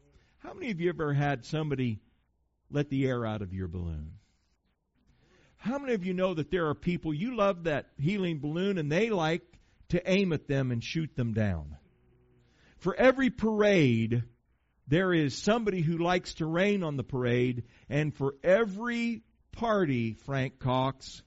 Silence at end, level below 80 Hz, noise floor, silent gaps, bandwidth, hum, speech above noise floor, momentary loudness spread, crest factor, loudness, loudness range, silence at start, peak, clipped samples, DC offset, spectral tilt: 0.05 s; -54 dBFS; -74 dBFS; none; 8 kHz; none; 45 dB; 10 LU; 20 dB; -30 LUFS; 7 LU; 0.45 s; -10 dBFS; under 0.1%; under 0.1%; -6 dB/octave